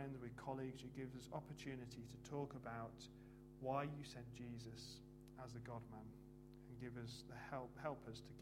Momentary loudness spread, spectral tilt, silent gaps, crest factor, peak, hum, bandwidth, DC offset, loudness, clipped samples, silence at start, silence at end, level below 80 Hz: 11 LU; -6 dB/octave; none; 22 dB; -30 dBFS; none; 16 kHz; under 0.1%; -53 LUFS; under 0.1%; 0 s; 0 s; -70 dBFS